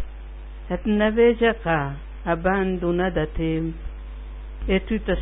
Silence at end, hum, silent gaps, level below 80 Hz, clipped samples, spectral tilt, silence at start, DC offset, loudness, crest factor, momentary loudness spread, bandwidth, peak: 0 s; none; none; -34 dBFS; under 0.1%; -11.5 dB/octave; 0 s; under 0.1%; -23 LUFS; 16 dB; 20 LU; 3.9 kHz; -6 dBFS